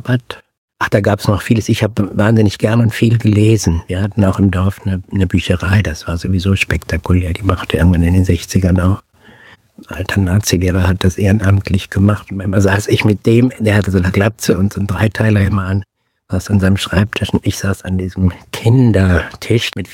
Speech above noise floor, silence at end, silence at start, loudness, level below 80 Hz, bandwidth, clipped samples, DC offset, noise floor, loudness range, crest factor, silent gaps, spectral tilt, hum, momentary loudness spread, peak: 30 dB; 0 s; 0.05 s; -14 LUFS; -32 dBFS; 16 kHz; 0.2%; under 0.1%; -43 dBFS; 2 LU; 14 dB; 0.58-0.68 s; -6.5 dB/octave; none; 7 LU; 0 dBFS